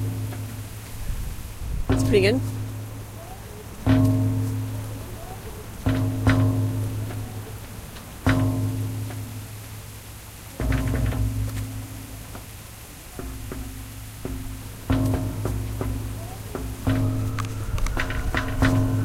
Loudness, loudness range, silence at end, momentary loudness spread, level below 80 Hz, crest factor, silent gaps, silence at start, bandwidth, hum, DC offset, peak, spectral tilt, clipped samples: -26 LUFS; 7 LU; 0 s; 17 LU; -34 dBFS; 20 dB; none; 0 s; 16 kHz; none; under 0.1%; -6 dBFS; -6.5 dB/octave; under 0.1%